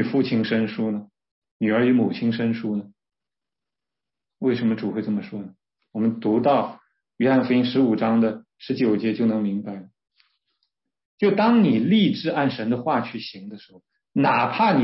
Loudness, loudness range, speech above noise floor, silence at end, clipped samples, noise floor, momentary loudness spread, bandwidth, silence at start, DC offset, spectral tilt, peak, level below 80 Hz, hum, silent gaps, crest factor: -22 LUFS; 5 LU; 69 dB; 0 s; under 0.1%; -90 dBFS; 14 LU; 5.8 kHz; 0 s; under 0.1%; -10.5 dB/octave; -8 dBFS; -68 dBFS; none; 1.31-1.42 s, 1.51-1.60 s, 11.05-11.18 s; 16 dB